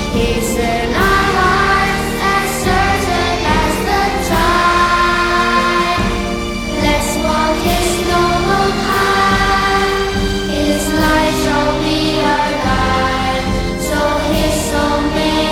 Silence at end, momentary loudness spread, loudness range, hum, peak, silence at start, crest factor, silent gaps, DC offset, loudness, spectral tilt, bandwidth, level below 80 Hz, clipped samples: 0 s; 4 LU; 2 LU; none; -2 dBFS; 0 s; 12 dB; none; under 0.1%; -14 LUFS; -4 dB/octave; 17.5 kHz; -26 dBFS; under 0.1%